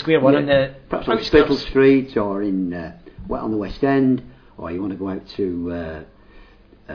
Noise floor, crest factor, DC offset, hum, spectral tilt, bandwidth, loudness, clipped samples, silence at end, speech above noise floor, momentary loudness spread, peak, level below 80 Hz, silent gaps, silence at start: -48 dBFS; 18 dB; under 0.1%; none; -7.5 dB/octave; 5.4 kHz; -20 LUFS; under 0.1%; 0 s; 29 dB; 15 LU; -2 dBFS; -40 dBFS; none; 0 s